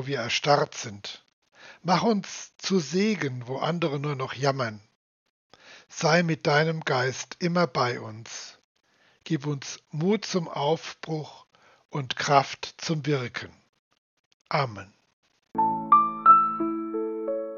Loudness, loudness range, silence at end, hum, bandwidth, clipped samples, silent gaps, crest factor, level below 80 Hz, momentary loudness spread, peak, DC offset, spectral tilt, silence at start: -26 LUFS; 7 LU; 0 s; none; 7.4 kHz; under 0.1%; 1.33-1.42 s, 4.96-5.50 s, 8.64-8.75 s, 13.69-13.73 s, 13.79-13.91 s, 13.98-14.45 s, 15.13-15.23 s; 22 dB; -74 dBFS; 16 LU; -4 dBFS; under 0.1%; -5 dB/octave; 0 s